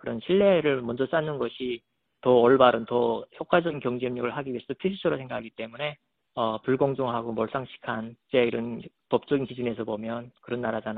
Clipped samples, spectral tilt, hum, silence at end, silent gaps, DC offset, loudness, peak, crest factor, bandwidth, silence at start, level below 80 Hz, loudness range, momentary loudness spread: under 0.1%; -4.5 dB/octave; none; 0 s; none; under 0.1%; -27 LUFS; -4 dBFS; 22 dB; 4.6 kHz; 0.05 s; -62 dBFS; 6 LU; 14 LU